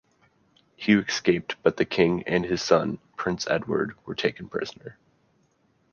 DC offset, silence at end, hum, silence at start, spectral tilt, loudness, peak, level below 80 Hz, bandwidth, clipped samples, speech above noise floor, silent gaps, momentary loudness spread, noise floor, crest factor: under 0.1%; 1 s; none; 0.8 s; -5 dB/octave; -25 LUFS; -4 dBFS; -58 dBFS; 7.2 kHz; under 0.1%; 42 dB; none; 10 LU; -67 dBFS; 22 dB